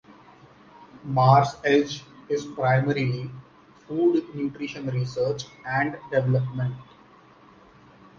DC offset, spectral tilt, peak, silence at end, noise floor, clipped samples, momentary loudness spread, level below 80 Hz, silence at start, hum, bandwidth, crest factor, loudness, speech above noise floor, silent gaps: under 0.1%; -7 dB/octave; -4 dBFS; 1.35 s; -53 dBFS; under 0.1%; 14 LU; -60 dBFS; 0.8 s; none; 7.2 kHz; 22 dB; -24 LUFS; 29 dB; none